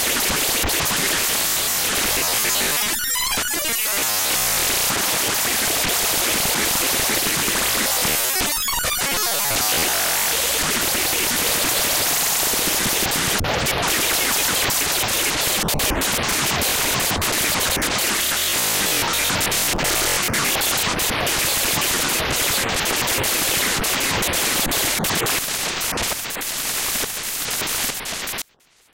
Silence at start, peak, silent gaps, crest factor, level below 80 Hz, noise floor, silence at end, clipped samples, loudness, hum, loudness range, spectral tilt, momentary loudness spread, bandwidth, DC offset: 0 s; -4 dBFS; none; 16 dB; -40 dBFS; -57 dBFS; 0.5 s; under 0.1%; -18 LUFS; none; 2 LU; -1 dB/octave; 3 LU; 17.5 kHz; under 0.1%